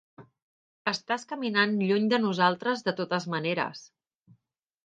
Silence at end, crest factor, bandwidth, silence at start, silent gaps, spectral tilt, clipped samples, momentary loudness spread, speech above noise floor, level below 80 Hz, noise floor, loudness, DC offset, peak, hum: 1 s; 22 dB; 9 kHz; 0.2 s; 0.42-0.85 s; -5.5 dB/octave; under 0.1%; 7 LU; 43 dB; -76 dBFS; -70 dBFS; -27 LUFS; under 0.1%; -8 dBFS; none